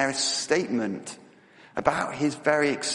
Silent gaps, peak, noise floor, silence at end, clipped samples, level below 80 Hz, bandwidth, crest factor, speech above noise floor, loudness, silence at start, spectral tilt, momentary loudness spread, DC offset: none; -4 dBFS; -53 dBFS; 0 s; under 0.1%; -62 dBFS; 11.5 kHz; 24 dB; 27 dB; -26 LUFS; 0 s; -3 dB/octave; 13 LU; under 0.1%